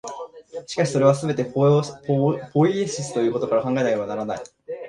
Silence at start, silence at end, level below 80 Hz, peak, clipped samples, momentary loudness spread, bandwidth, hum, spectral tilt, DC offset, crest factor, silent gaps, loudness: 0.05 s; 0 s; -62 dBFS; -2 dBFS; under 0.1%; 16 LU; 11 kHz; none; -6.5 dB/octave; under 0.1%; 20 dB; none; -22 LUFS